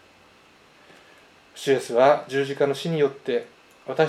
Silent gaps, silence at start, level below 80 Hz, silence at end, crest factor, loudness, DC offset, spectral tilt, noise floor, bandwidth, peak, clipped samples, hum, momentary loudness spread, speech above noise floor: none; 1.55 s; -74 dBFS; 0 s; 20 dB; -23 LUFS; under 0.1%; -5.5 dB/octave; -54 dBFS; 14.5 kHz; -4 dBFS; under 0.1%; none; 12 LU; 32 dB